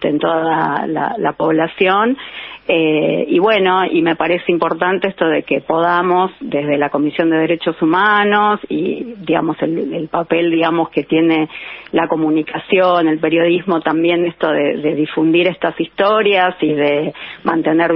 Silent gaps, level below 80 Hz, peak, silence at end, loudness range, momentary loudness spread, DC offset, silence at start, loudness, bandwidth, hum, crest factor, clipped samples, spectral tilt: none; -58 dBFS; -2 dBFS; 0 s; 2 LU; 7 LU; under 0.1%; 0 s; -15 LUFS; 5.4 kHz; none; 14 dB; under 0.1%; -3.5 dB/octave